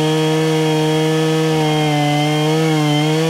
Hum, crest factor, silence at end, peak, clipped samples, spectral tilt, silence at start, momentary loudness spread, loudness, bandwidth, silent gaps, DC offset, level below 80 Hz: none; 10 dB; 0 s; -4 dBFS; under 0.1%; -5.5 dB/octave; 0 s; 0 LU; -15 LUFS; 16 kHz; none; under 0.1%; -56 dBFS